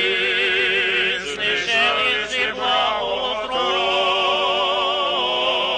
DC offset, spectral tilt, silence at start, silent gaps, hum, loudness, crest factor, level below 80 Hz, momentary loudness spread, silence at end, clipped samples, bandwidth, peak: under 0.1%; -1.5 dB/octave; 0 s; none; none; -18 LUFS; 12 dB; -52 dBFS; 4 LU; 0 s; under 0.1%; 10 kHz; -8 dBFS